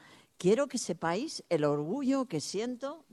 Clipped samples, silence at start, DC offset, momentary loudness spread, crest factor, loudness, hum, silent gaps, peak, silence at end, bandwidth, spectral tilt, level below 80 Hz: under 0.1%; 0.1 s; under 0.1%; 7 LU; 16 dB; -32 LUFS; none; none; -16 dBFS; 0.15 s; 13 kHz; -5 dB/octave; -74 dBFS